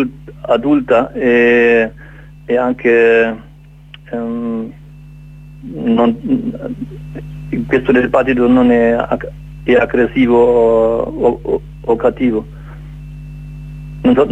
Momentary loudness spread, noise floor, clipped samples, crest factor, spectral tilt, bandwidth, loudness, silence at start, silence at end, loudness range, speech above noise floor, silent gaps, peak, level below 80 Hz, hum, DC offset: 21 LU; -38 dBFS; under 0.1%; 14 dB; -8 dB/octave; 8 kHz; -13 LUFS; 0 s; 0 s; 7 LU; 25 dB; none; 0 dBFS; -36 dBFS; none; under 0.1%